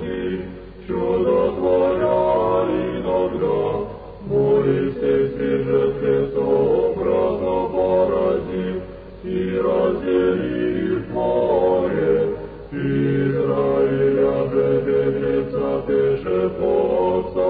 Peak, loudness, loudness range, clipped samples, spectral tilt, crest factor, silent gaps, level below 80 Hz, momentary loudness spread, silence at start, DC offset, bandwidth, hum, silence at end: -6 dBFS; -20 LUFS; 2 LU; under 0.1%; -11.5 dB/octave; 12 dB; none; -42 dBFS; 8 LU; 0 s; under 0.1%; 4.8 kHz; none; 0 s